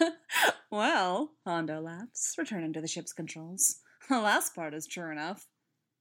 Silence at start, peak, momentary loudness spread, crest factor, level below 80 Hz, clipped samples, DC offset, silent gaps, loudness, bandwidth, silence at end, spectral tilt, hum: 0 s; -12 dBFS; 13 LU; 20 dB; -90 dBFS; under 0.1%; under 0.1%; none; -31 LUFS; 17.5 kHz; 0.55 s; -2 dB/octave; none